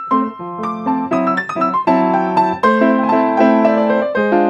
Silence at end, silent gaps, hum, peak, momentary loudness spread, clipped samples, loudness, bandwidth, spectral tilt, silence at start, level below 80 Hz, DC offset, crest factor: 0 s; none; none; 0 dBFS; 7 LU; under 0.1%; -15 LUFS; 8 kHz; -7.5 dB/octave; 0 s; -60 dBFS; under 0.1%; 14 dB